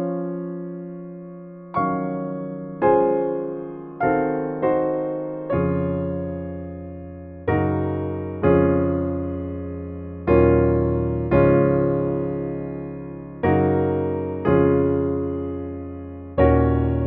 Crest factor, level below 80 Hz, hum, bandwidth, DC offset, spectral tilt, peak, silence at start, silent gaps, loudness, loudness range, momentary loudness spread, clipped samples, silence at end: 18 dB; -36 dBFS; none; 4.2 kHz; under 0.1%; -9 dB/octave; -4 dBFS; 0 s; none; -22 LUFS; 5 LU; 16 LU; under 0.1%; 0 s